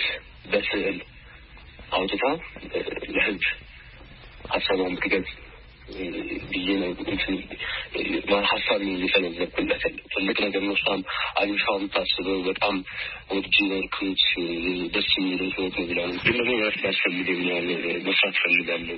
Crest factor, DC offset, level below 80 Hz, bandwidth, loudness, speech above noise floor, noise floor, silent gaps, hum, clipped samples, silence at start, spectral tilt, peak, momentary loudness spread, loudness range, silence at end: 20 dB; under 0.1%; -50 dBFS; 5.8 kHz; -24 LUFS; 21 dB; -46 dBFS; none; none; under 0.1%; 0 s; -8.5 dB/octave; -6 dBFS; 10 LU; 5 LU; 0 s